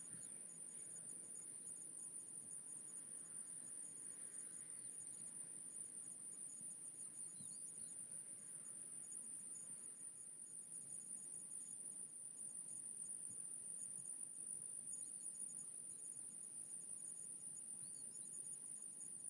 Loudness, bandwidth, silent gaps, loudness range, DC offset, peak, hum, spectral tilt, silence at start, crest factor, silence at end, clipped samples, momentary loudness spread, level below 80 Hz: -49 LUFS; 12 kHz; none; 2 LU; under 0.1%; -34 dBFS; none; -1 dB/octave; 0 s; 18 dB; 0 s; under 0.1%; 3 LU; under -90 dBFS